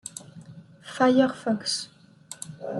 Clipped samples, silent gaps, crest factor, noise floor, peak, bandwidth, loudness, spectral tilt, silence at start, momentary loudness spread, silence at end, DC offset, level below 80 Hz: under 0.1%; none; 20 dB; -47 dBFS; -8 dBFS; 12 kHz; -24 LUFS; -4 dB/octave; 0.05 s; 25 LU; 0 s; under 0.1%; -70 dBFS